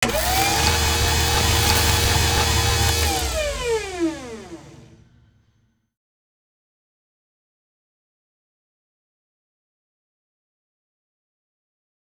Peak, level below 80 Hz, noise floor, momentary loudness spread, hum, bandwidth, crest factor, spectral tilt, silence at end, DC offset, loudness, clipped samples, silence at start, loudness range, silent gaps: -2 dBFS; -32 dBFS; -64 dBFS; 9 LU; none; over 20 kHz; 22 dB; -3 dB/octave; 7.3 s; under 0.1%; -19 LUFS; under 0.1%; 0 s; 14 LU; none